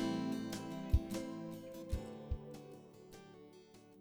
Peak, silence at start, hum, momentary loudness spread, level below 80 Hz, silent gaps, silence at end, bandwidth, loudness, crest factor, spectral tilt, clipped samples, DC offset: -18 dBFS; 0 s; none; 20 LU; -46 dBFS; none; 0 s; over 20 kHz; -43 LUFS; 24 dB; -6.5 dB/octave; under 0.1%; under 0.1%